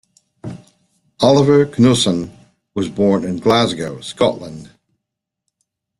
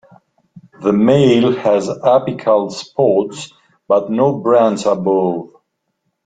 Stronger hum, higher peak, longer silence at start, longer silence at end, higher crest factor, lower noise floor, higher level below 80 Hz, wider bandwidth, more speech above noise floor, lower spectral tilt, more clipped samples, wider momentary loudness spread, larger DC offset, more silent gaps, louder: neither; about the same, -2 dBFS vs 0 dBFS; about the same, 0.45 s vs 0.55 s; first, 1.35 s vs 0.8 s; about the same, 16 dB vs 14 dB; first, -80 dBFS vs -70 dBFS; about the same, -52 dBFS vs -56 dBFS; first, 12.5 kHz vs 9.2 kHz; first, 65 dB vs 57 dB; about the same, -5.5 dB/octave vs -6.5 dB/octave; neither; first, 21 LU vs 10 LU; neither; neither; about the same, -15 LUFS vs -15 LUFS